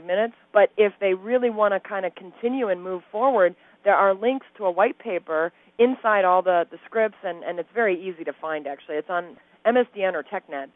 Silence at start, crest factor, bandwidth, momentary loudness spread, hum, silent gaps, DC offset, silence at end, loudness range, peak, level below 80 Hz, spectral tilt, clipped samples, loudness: 0 s; 18 dB; 4 kHz; 11 LU; none; none; under 0.1%; 0.1 s; 4 LU; -4 dBFS; -70 dBFS; -9 dB/octave; under 0.1%; -23 LUFS